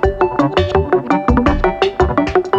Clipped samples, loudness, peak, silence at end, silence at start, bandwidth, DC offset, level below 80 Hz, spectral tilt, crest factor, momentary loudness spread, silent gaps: under 0.1%; -15 LUFS; 0 dBFS; 0 s; 0 s; 7.8 kHz; under 0.1%; -24 dBFS; -7.5 dB/octave; 14 dB; 2 LU; none